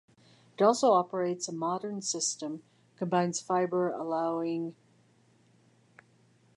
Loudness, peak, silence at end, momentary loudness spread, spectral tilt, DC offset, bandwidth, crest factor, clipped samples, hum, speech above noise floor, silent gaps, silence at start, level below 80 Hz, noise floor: -30 LUFS; -12 dBFS; 1.85 s; 13 LU; -4.5 dB/octave; under 0.1%; 11.5 kHz; 20 dB; under 0.1%; none; 35 dB; none; 0.6 s; -86 dBFS; -65 dBFS